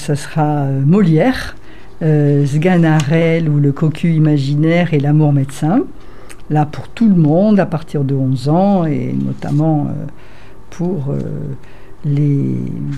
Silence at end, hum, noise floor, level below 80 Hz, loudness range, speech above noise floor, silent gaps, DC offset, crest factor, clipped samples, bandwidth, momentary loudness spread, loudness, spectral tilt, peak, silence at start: 0 s; none; -34 dBFS; -40 dBFS; 6 LU; 20 dB; none; 4%; 12 dB; under 0.1%; 11 kHz; 10 LU; -14 LUFS; -8 dB/octave; -2 dBFS; 0 s